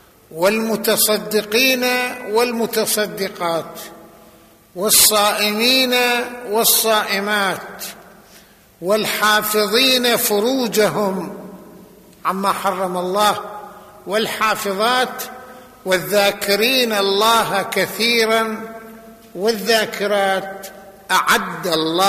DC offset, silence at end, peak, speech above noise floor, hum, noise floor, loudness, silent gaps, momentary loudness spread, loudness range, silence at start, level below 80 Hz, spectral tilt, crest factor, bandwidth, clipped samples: under 0.1%; 0 s; 0 dBFS; 30 dB; none; -48 dBFS; -16 LUFS; none; 18 LU; 5 LU; 0.3 s; -56 dBFS; -2 dB/octave; 18 dB; 15 kHz; under 0.1%